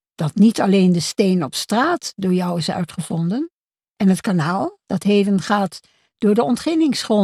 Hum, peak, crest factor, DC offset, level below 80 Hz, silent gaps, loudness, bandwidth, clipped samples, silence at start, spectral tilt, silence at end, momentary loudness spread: none; -4 dBFS; 14 dB; under 0.1%; -60 dBFS; 3.53-3.67 s, 3.91-3.95 s; -19 LUFS; 13.5 kHz; under 0.1%; 0.2 s; -6 dB/octave; 0 s; 9 LU